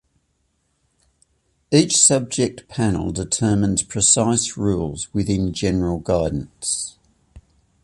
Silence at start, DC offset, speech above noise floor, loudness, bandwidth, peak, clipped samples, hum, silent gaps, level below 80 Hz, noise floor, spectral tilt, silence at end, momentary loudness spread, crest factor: 1.7 s; under 0.1%; 49 dB; -19 LUFS; 11.5 kHz; -2 dBFS; under 0.1%; none; none; -40 dBFS; -68 dBFS; -4 dB/octave; 0.45 s; 10 LU; 20 dB